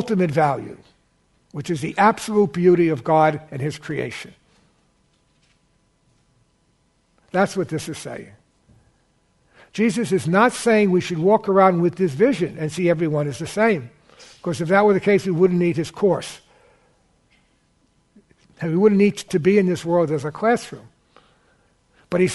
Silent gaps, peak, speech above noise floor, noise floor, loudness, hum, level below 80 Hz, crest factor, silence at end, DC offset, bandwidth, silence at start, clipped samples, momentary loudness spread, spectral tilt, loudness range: none; -2 dBFS; 45 dB; -64 dBFS; -20 LUFS; none; -58 dBFS; 18 dB; 0 s; under 0.1%; 11.5 kHz; 0 s; under 0.1%; 14 LU; -6.5 dB/octave; 10 LU